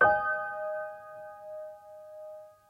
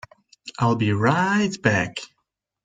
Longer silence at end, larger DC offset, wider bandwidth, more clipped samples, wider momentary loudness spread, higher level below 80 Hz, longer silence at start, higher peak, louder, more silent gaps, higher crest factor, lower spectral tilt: second, 0.15 s vs 0.6 s; neither; first, 15 kHz vs 9.4 kHz; neither; about the same, 18 LU vs 16 LU; second, -66 dBFS vs -56 dBFS; second, 0 s vs 0.45 s; second, -10 dBFS vs -2 dBFS; second, -32 LUFS vs -21 LUFS; neither; about the same, 22 dB vs 20 dB; about the same, -6 dB/octave vs -6 dB/octave